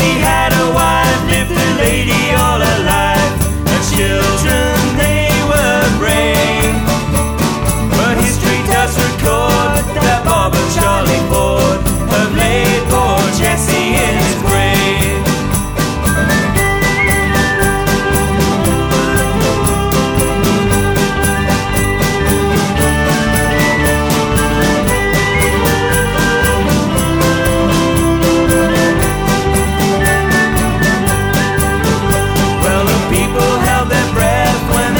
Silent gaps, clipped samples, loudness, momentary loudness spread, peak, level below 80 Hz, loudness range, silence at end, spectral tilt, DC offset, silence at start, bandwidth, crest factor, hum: none; under 0.1%; -12 LUFS; 2 LU; 0 dBFS; -22 dBFS; 1 LU; 0 s; -4.5 dB/octave; under 0.1%; 0 s; over 20 kHz; 12 dB; none